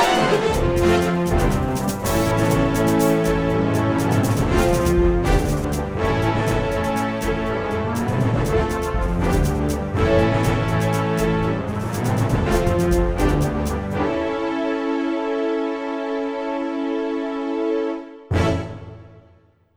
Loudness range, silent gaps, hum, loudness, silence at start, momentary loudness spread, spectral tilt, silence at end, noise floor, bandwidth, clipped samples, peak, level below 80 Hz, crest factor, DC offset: 5 LU; none; none; -21 LUFS; 0 s; 7 LU; -6.5 dB/octave; 0.55 s; -54 dBFS; over 20 kHz; under 0.1%; -4 dBFS; -30 dBFS; 16 dB; under 0.1%